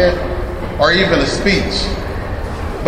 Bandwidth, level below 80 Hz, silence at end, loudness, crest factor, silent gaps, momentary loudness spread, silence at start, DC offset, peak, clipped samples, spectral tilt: 15.5 kHz; -24 dBFS; 0 s; -16 LUFS; 16 dB; none; 11 LU; 0 s; 0.4%; 0 dBFS; under 0.1%; -5 dB/octave